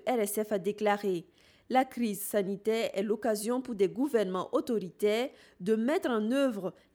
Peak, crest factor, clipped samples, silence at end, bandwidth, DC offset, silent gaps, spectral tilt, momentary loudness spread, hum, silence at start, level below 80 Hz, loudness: -14 dBFS; 16 dB; under 0.1%; 0.25 s; over 20 kHz; under 0.1%; none; -5 dB/octave; 5 LU; none; 0.05 s; -74 dBFS; -31 LUFS